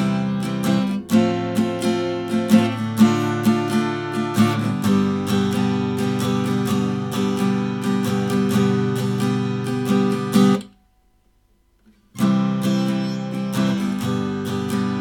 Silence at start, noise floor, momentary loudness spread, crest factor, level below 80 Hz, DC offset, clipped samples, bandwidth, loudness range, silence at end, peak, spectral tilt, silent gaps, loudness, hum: 0 s; -60 dBFS; 6 LU; 18 dB; -58 dBFS; under 0.1%; under 0.1%; 18 kHz; 3 LU; 0 s; -2 dBFS; -6.5 dB/octave; none; -20 LUFS; none